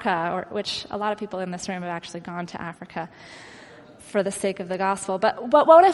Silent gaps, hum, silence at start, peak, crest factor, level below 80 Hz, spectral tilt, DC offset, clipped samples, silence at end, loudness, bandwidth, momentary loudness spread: none; none; 0 s; -2 dBFS; 20 dB; -62 dBFS; -4.5 dB/octave; under 0.1%; under 0.1%; 0 s; -24 LUFS; 12 kHz; 15 LU